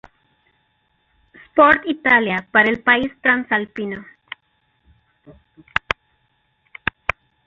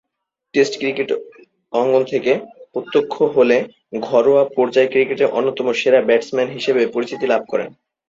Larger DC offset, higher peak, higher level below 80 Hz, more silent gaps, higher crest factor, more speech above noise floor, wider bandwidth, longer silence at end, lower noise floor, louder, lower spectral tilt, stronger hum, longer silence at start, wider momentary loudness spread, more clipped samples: neither; about the same, 0 dBFS vs -2 dBFS; first, -50 dBFS vs -64 dBFS; neither; first, 22 dB vs 16 dB; second, 49 dB vs 62 dB; about the same, 7.4 kHz vs 7.8 kHz; first, 2.15 s vs 0.4 s; second, -66 dBFS vs -79 dBFS; about the same, -18 LUFS vs -17 LUFS; about the same, -6 dB/octave vs -5 dB/octave; neither; first, 1.55 s vs 0.55 s; first, 19 LU vs 10 LU; neither